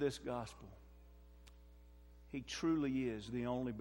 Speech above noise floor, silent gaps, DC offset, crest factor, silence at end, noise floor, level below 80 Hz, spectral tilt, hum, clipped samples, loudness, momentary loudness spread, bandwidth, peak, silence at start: 20 dB; none; under 0.1%; 16 dB; 0 s; -60 dBFS; -60 dBFS; -6 dB/octave; 60 Hz at -60 dBFS; under 0.1%; -41 LUFS; 26 LU; 16 kHz; -26 dBFS; 0 s